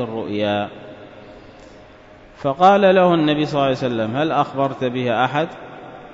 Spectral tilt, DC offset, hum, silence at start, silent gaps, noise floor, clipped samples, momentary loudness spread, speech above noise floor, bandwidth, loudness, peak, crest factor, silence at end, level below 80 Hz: -7 dB/octave; under 0.1%; none; 0 s; none; -44 dBFS; under 0.1%; 23 LU; 26 dB; 7.8 kHz; -18 LUFS; -2 dBFS; 18 dB; 0 s; -54 dBFS